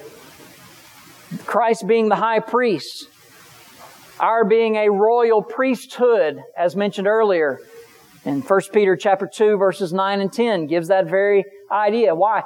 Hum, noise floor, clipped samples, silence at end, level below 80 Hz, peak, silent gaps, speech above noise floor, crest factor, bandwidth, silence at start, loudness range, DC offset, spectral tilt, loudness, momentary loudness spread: none; -47 dBFS; under 0.1%; 0 s; -76 dBFS; -4 dBFS; none; 29 dB; 16 dB; 18 kHz; 0 s; 3 LU; under 0.1%; -5.5 dB/octave; -18 LUFS; 7 LU